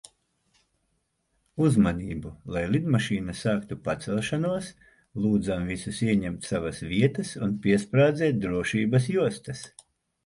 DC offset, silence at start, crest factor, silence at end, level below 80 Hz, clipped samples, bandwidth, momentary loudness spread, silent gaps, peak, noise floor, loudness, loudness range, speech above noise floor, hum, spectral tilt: under 0.1%; 1.55 s; 18 dB; 0.55 s; -50 dBFS; under 0.1%; 11.5 kHz; 13 LU; none; -8 dBFS; -74 dBFS; -26 LUFS; 3 LU; 49 dB; none; -6.5 dB/octave